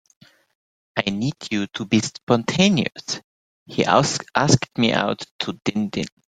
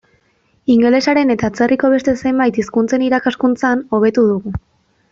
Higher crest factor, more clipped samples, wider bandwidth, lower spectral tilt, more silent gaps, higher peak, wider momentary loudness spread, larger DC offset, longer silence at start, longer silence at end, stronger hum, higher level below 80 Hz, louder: first, 22 dB vs 12 dB; neither; first, 9.4 kHz vs 7.6 kHz; second, -4.5 dB/octave vs -6 dB/octave; first, 2.23-2.27 s, 3.24-3.66 s, 5.31-5.39 s vs none; about the same, 0 dBFS vs -2 dBFS; first, 12 LU vs 5 LU; neither; first, 0.95 s vs 0.7 s; second, 0.25 s vs 0.55 s; neither; second, -56 dBFS vs -44 dBFS; second, -21 LUFS vs -15 LUFS